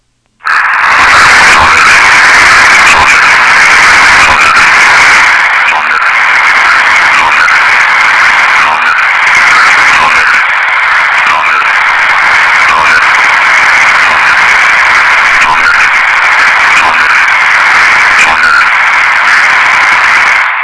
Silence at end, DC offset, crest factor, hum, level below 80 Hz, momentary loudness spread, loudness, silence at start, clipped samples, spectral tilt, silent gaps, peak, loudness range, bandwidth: 0 s; 0.5%; 4 dB; none; -36 dBFS; 4 LU; -3 LUFS; 0.45 s; 20%; 0 dB/octave; none; 0 dBFS; 3 LU; 11 kHz